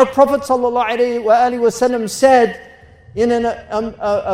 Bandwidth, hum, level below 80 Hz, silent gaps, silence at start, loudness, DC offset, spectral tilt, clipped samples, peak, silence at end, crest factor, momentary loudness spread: 16 kHz; none; -48 dBFS; none; 0 s; -15 LUFS; under 0.1%; -4.5 dB/octave; under 0.1%; 0 dBFS; 0 s; 14 dB; 9 LU